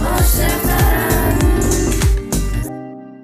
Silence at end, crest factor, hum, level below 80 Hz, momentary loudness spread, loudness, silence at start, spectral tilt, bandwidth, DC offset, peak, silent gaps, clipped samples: 0 s; 12 dB; none; -18 dBFS; 10 LU; -16 LUFS; 0 s; -5 dB/octave; 16 kHz; under 0.1%; -2 dBFS; none; under 0.1%